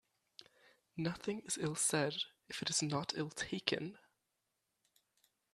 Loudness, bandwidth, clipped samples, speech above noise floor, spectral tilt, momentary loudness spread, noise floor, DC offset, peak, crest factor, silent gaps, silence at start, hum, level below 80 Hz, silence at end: -38 LUFS; 13.5 kHz; under 0.1%; 47 dB; -3 dB/octave; 9 LU; -86 dBFS; under 0.1%; -12 dBFS; 28 dB; none; 0.95 s; none; -76 dBFS; 1.55 s